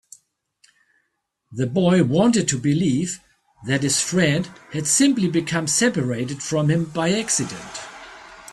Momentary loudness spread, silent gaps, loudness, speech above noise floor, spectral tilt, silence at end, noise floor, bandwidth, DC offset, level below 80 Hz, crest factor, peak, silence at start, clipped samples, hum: 17 LU; none; -20 LUFS; 54 dB; -4.5 dB/octave; 0 s; -74 dBFS; 13.5 kHz; under 0.1%; -56 dBFS; 18 dB; -4 dBFS; 1.5 s; under 0.1%; none